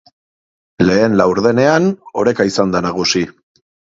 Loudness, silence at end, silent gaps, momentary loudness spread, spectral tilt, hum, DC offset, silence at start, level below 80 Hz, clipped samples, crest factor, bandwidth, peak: -14 LUFS; 0.7 s; none; 6 LU; -5 dB/octave; none; under 0.1%; 0.8 s; -46 dBFS; under 0.1%; 16 dB; 7.8 kHz; 0 dBFS